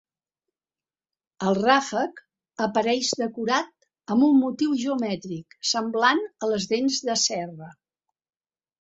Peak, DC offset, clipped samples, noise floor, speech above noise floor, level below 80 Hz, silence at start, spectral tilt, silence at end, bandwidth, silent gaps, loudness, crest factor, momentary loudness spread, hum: -4 dBFS; under 0.1%; under 0.1%; under -90 dBFS; over 66 dB; -70 dBFS; 1.4 s; -3.5 dB/octave; 1.1 s; 8 kHz; none; -24 LUFS; 22 dB; 12 LU; none